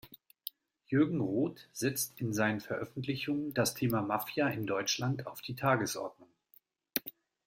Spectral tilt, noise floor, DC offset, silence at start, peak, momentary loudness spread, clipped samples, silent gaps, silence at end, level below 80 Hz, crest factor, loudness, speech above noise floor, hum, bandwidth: -4.5 dB/octave; -67 dBFS; under 0.1%; 0.05 s; -10 dBFS; 11 LU; under 0.1%; none; 0.35 s; -70 dBFS; 24 dB; -33 LUFS; 34 dB; none; 16.5 kHz